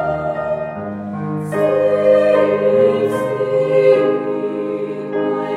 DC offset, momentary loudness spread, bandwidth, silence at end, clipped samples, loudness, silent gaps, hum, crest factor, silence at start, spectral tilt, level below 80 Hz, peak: under 0.1%; 11 LU; 11.5 kHz; 0 s; under 0.1%; -17 LUFS; none; none; 14 dB; 0 s; -7.5 dB/octave; -54 dBFS; -2 dBFS